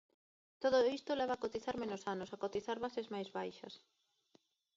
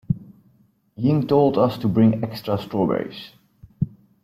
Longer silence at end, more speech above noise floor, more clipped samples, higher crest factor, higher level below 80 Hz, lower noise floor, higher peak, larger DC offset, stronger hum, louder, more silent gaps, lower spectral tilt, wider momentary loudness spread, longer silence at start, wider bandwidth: first, 1 s vs 0.35 s; second, 35 dB vs 40 dB; neither; about the same, 20 dB vs 18 dB; second, -76 dBFS vs -52 dBFS; first, -74 dBFS vs -59 dBFS; second, -20 dBFS vs -4 dBFS; neither; neither; second, -39 LUFS vs -21 LUFS; neither; second, -3 dB/octave vs -9.5 dB/octave; about the same, 13 LU vs 11 LU; first, 0.6 s vs 0.1 s; second, 7.6 kHz vs 15 kHz